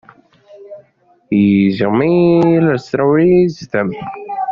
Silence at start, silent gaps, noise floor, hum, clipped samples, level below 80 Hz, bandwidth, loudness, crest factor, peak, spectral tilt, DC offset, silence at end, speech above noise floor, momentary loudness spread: 0.55 s; none; -54 dBFS; none; under 0.1%; -50 dBFS; 7.2 kHz; -13 LUFS; 12 dB; -2 dBFS; -7 dB/octave; under 0.1%; 0 s; 41 dB; 11 LU